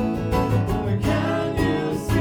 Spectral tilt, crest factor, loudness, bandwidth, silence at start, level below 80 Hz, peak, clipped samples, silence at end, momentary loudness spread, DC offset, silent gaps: -7 dB/octave; 14 dB; -23 LUFS; 18 kHz; 0 s; -34 dBFS; -8 dBFS; under 0.1%; 0 s; 2 LU; under 0.1%; none